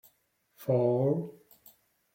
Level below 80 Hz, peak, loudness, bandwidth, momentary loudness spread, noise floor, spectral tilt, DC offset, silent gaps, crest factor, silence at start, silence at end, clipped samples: -74 dBFS; -14 dBFS; -29 LUFS; 16.5 kHz; 14 LU; -72 dBFS; -10 dB/octave; under 0.1%; none; 18 dB; 0.6 s; 0.85 s; under 0.1%